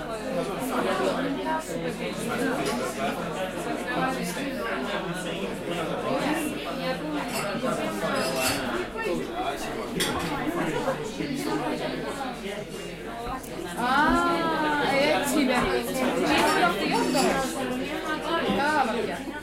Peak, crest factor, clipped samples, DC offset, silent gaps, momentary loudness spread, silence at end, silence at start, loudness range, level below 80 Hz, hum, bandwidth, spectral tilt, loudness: -10 dBFS; 18 dB; under 0.1%; under 0.1%; none; 9 LU; 0 s; 0 s; 6 LU; -48 dBFS; none; 16 kHz; -4 dB/octave; -27 LUFS